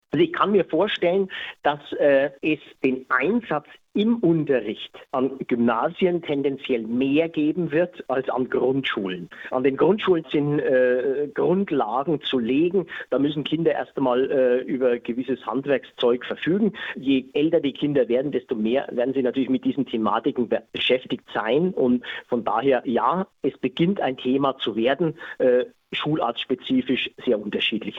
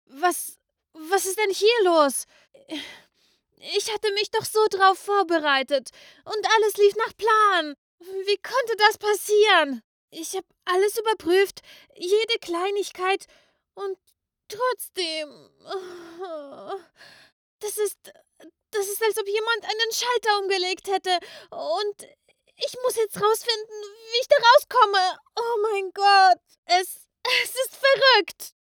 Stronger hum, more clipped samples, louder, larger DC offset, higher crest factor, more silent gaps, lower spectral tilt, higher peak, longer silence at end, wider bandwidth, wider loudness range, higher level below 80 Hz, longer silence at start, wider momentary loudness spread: neither; neither; about the same, -23 LUFS vs -22 LUFS; neither; about the same, 16 dB vs 20 dB; second, none vs 7.78-7.98 s, 9.84-10.08 s, 17.32-17.59 s, 26.58-26.63 s; first, -8 dB/octave vs -1 dB/octave; about the same, -6 dBFS vs -4 dBFS; second, 0 s vs 0.2 s; second, 6.4 kHz vs over 20 kHz; second, 1 LU vs 12 LU; first, -64 dBFS vs -74 dBFS; about the same, 0.15 s vs 0.15 s; second, 6 LU vs 18 LU